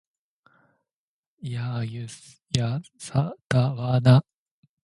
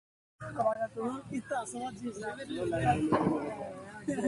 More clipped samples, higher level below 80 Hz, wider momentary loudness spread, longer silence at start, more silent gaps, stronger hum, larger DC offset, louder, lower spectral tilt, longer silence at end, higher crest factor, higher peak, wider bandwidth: neither; about the same, -56 dBFS vs -58 dBFS; first, 19 LU vs 12 LU; first, 1.45 s vs 0.4 s; first, 3.45-3.50 s vs none; neither; neither; first, -25 LUFS vs -34 LUFS; about the same, -6.5 dB/octave vs -6 dB/octave; first, 0.65 s vs 0 s; about the same, 24 dB vs 20 dB; first, -2 dBFS vs -14 dBFS; about the same, 11.5 kHz vs 11.5 kHz